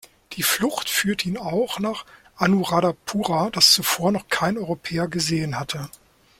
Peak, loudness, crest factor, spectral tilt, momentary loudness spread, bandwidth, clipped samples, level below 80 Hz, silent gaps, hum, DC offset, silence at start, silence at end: -2 dBFS; -21 LUFS; 22 dB; -3.5 dB/octave; 13 LU; 16.5 kHz; under 0.1%; -54 dBFS; none; none; under 0.1%; 0.3 s; 0.5 s